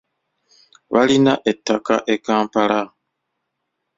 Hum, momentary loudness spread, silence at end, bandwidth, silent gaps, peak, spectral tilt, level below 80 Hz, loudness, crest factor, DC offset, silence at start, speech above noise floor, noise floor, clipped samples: none; 7 LU; 1.1 s; 7.8 kHz; none; -2 dBFS; -5 dB/octave; -60 dBFS; -18 LUFS; 18 dB; under 0.1%; 0.9 s; 59 dB; -76 dBFS; under 0.1%